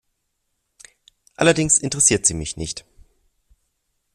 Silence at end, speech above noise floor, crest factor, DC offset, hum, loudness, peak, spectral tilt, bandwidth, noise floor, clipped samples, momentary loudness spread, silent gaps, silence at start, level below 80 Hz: 1.35 s; 55 dB; 22 dB; under 0.1%; none; -18 LUFS; 0 dBFS; -3 dB/octave; 14 kHz; -74 dBFS; under 0.1%; 15 LU; none; 1.4 s; -46 dBFS